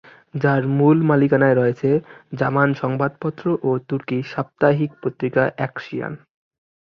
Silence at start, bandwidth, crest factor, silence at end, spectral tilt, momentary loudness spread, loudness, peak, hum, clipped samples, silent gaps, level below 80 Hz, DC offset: 0.35 s; 6.2 kHz; 16 dB; 0.7 s; -9.5 dB/octave; 13 LU; -20 LUFS; -2 dBFS; none; under 0.1%; none; -60 dBFS; under 0.1%